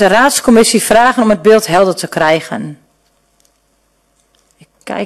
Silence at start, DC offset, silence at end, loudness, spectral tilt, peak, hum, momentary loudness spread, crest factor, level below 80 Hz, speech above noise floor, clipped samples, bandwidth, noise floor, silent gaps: 0 s; under 0.1%; 0 s; -10 LUFS; -3.5 dB/octave; 0 dBFS; none; 15 LU; 12 dB; -44 dBFS; 48 dB; under 0.1%; 14 kHz; -58 dBFS; none